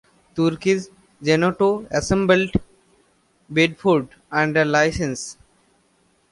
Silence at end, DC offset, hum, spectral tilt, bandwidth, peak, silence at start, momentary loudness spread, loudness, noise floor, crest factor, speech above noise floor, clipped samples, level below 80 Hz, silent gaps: 1 s; under 0.1%; none; -5 dB/octave; 11.5 kHz; -4 dBFS; 0.35 s; 10 LU; -20 LUFS; -62 dBFS; 18 dB; 43 dB; under 0.1%; -44 dBFS; none